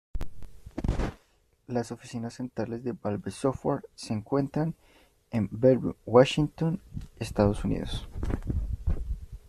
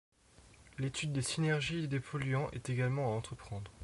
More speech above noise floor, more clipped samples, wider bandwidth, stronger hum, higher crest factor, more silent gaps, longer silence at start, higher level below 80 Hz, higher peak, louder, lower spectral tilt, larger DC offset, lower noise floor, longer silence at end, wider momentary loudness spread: first, 38 dB vs 26 dB; neither; first, 13.5 kHz vs 11.5 kHz; neither; first, 24 dB vs 16 dB; neither; second, 0.15 s vs 0.4 s; first, -38 dBFS vs -60 dBFS; first, -6 dBFS vs -22 dBFS; first, -29 LUFS vs -36 LUFS; first, -7 dB/octave vs -5.5 dB/octave; neither; first, -66 dBFS vs -61 dBFS; about the same, 0.1 s vs 0 s; about the same, 14 LU vs 12 LU